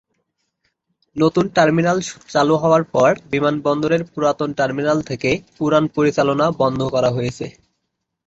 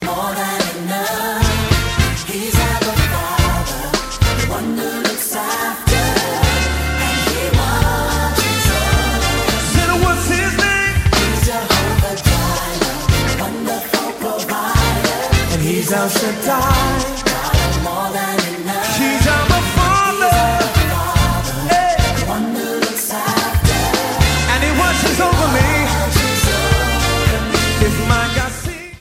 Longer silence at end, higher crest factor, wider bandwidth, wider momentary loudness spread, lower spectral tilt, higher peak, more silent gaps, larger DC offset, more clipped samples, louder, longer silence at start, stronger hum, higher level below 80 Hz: first, 0.75 s vs 0 s; about the same, 18 dB vs 16 dB; second, 8.2 kHz vs 16.5 kHz; about the same, 6 LU vs 6 LU; first, -6 dB/octave vs -4 dB/octave; about the same, -2 dBFS vs 0 dBFS; neither; neither; neither; about the same, -18 LUFS vs -16 LUFS; first, 1.15 s vs 0 s; neither; second, -52 dBFS vs -24 dBFS